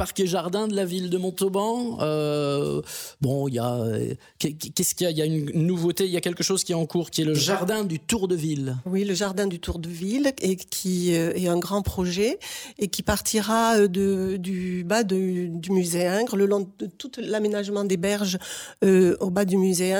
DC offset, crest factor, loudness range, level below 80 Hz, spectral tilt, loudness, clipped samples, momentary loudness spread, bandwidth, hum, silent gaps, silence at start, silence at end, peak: under 0.1%; 16 dB; 3 LU; -50 dBFS; -5 dB/octave; -24 LUFS; under 0.1%; 7 LU; over 20 kHz; none; none; 0 s; 0 s; -8 dBFS